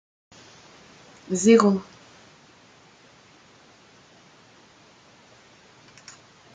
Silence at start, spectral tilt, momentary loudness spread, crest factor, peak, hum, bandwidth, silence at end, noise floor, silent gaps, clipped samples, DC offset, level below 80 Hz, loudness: 1.3 s; -5 dB/octave; 31 LU; 24 dB; -4 dBFS; none; 9.4 kHz; 4.7 s; -54 dBFS; none; under 0.1%; under 0.1%; -72 dBFS; -20 LUFS